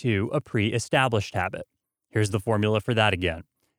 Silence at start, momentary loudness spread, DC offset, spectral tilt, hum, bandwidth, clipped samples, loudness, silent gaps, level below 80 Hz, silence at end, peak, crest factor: 0 s; 9 LU; under 0.1%; -5.5 dB/octave; none; 15.5 kHz; under 0.1%; -25 LUFS; none; -52 dBFS; 0.35 s; -4 dBFS; 20 dB